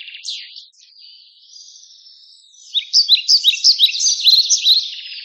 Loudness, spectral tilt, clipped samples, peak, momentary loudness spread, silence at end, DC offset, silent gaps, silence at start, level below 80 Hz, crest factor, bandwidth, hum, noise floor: -11 LUFS; 15.5 dB/octave; under 0.1%; -2 dBFS; 17 LU; 0 s; under 0.1%; none; 0 s; under -90 dBFS; 16 dB; 17 kHz; none; -46 dBFS